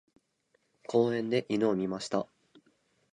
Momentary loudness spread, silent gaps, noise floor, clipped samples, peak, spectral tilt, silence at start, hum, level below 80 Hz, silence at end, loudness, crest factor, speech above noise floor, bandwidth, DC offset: 10 LU; none; -74 dBFS; under 0.1%; -12 dBFS; -6 dB/octave; 0.9 s; none; -72 dBFS; 0.85 s; -30 LUFS; 20 dB; 45 dB; 10.5 kHz; under 0.1%